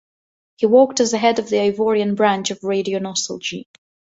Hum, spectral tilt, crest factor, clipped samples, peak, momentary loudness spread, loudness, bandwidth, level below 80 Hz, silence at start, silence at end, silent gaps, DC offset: none; -4 dB/octave; 18 dB; under 0.1%; -2 dBFS; 10 LU; -18 LUFS; 8 kHz; -64 dBFS; 0.6 s; 0.5 s; none; under 0.1%